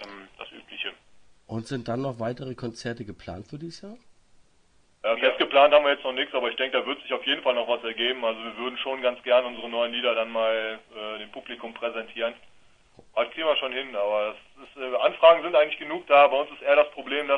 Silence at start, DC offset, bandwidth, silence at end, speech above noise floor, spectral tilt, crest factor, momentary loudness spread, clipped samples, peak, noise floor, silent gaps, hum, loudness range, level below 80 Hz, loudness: 0 s; under 0.1%; 9.8 kHz; 0 s; 36 dB; -5 dB/octave; 22 dB; 20 LU; under 0.1%; -4 dBFS; -61 dBFS; none; none; 12 LU; -64 dBFS; -24 LUFS